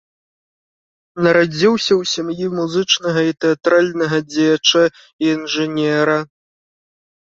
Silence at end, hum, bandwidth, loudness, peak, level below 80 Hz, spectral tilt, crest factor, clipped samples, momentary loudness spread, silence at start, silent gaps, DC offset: 1.05 s; none; 7.8 kHz; -16 LUFS; 0 dBFS; -60 dBFS; -4 dB/octave; 18 dB; under 0.1%; 7 LU; 1.15 s; 5.13-5.19 s; under 0.1%